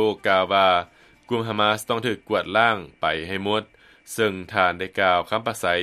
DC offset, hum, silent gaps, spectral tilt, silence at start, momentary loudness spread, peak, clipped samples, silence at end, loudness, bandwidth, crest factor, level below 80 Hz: under 0.1%; none; none; -4 dB/octave; 0 s; 7 LU; -2 dBFS; under 0.1%; 0 s; -22 LUFS; 14.5 kHz; 20 dB; -58 dBFS